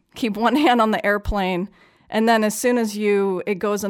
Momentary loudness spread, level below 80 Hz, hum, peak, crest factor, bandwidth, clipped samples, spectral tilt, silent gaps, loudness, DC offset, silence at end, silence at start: 9 LU; -38 dBFS; none; -6 dBFS; 14 dB; 18 kHz; under 0.1%; -4.5 dB/octave; none; -20 LUFS; under 0.1%; 0 s; 0.15 s